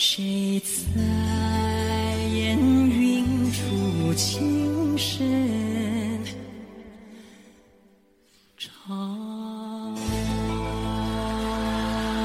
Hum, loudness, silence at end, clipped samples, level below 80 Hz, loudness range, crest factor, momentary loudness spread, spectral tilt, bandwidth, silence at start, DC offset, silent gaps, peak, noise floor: none; -25 LUFS; 0 s; under 0.1%; -40 dBFS; 14 LU; 16 dB; 13 LU; -5 dB/octave; 16 kHz; 0 s; under 0.1%; none; -8 dBFS; -60 dBFS